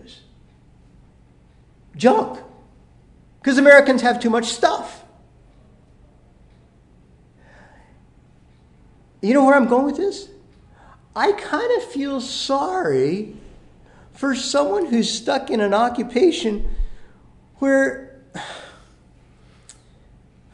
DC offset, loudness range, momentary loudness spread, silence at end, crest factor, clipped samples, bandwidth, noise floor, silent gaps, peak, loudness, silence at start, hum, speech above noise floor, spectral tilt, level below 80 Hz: under 0.1%; 9 LU; 20 LU; 1.85 s; 22 dB; under 0.1%; 11 kHz; -52 dBFS; none; 0 dBFS; -18 LUFS; 0.1 s; none; 34 dB; -4 dB/octave; -40 dBFS